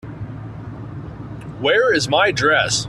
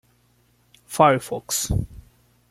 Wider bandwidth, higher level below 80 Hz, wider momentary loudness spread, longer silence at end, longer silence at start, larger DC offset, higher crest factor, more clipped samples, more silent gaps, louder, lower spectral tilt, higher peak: second, 13 kHz vs 16.5 kHz; second, -46 dBFS vs -40 dBFS; first, 18 LU vs 14 LU; second, 0 s vs 0.5 s; second, 0.05 s vs 0.9 s; neither; about the same, 18 dB vs 22 dB; neither; neither; first, -16 LUFS vs -21 LUFS; about the same, -3.5 dB/octave vs -4 dB/octave; about the same, -2 dBFS vs -2 dBFS